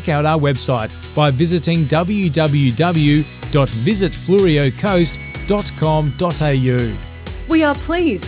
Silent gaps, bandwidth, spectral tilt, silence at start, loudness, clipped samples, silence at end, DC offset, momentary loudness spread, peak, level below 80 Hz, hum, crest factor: none; 4 kHz; -11.5 dB/octave; 0 s; -16 LUFS; under 0.1%; 0 s; under 0.1%; 6 LU; -2 dBFS; -32 dBFS; none; 14 dB